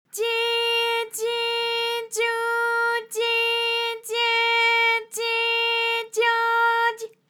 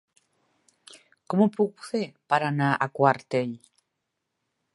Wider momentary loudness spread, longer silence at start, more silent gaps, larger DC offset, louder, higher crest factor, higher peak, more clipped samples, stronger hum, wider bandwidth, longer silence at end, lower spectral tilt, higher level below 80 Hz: second, 6 LU vs 9 LU; second, 0.15 s vs 1.3 s; neither; neither; first, -21 LUFS vs -25 LUFS; second, 14 dB vs 24 dB; second, -10 dBFS vs -4 dBFS; neither; neither; first, 19.5 kHz vs 11.5 kHz; second, 0.2 s vs 1.2 s; second, 2.5 dB/octave vs -7 dB/octave; second, under -90 dBFS vs -76 dBFS